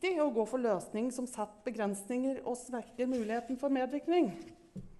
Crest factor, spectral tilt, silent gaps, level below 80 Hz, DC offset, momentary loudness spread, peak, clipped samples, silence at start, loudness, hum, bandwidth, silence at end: 14 dB; -5 dB/octave; none; -66 dBFS; under 0.1%; 9 LU; -20 dBFS; under 0.1%; 0 s; -35 LUFS; none; 12 kHz; 0.05 s